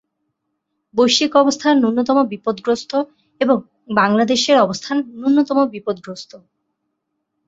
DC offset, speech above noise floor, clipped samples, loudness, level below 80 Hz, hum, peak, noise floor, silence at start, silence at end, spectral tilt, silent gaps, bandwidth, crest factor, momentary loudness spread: under 0.1%; 58 dB; under 0.1%; -17 LUFS; -62 dBFS; none; -2 dBFS; -74 dBFS; 0.95 s; 1.1 s; -4 dB/octave; none; 8 kHz; 16 dB; 12 LU